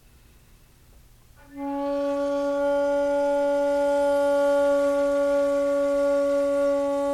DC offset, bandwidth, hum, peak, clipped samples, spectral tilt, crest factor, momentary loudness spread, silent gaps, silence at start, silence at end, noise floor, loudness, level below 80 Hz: under 0.1%; 12.5 kHz; none; -14 dBFS; under 0.1%; -4.5 dB/octave; 8 dB; 5 LU; none; 1.5 s; 0 s; -54 dBFS; -23 LUFS; -54 dBFS